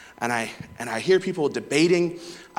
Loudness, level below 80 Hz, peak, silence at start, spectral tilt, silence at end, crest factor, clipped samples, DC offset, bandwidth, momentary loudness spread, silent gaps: -24 LUFS; -64 dBFS; -6 dBFS; 0 s; -5 dB/octave; 0.15 s; 18 dB; under 0.1%; under 0.1%; 16 kHz; 13 LU; none